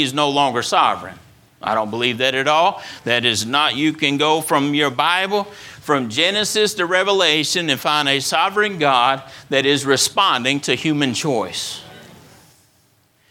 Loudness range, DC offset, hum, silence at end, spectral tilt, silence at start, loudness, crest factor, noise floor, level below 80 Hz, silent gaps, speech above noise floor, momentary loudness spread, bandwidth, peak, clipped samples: 2 LU; under 0.1%; none; 1.15 s; -3 dB/octave; 0 s; -17 LUFS; 18 dB; -58 dBFS; -62 dBFS; none; 40 dB; 8 LU; 17.5 kHz; 0 dBFS; under 0.1%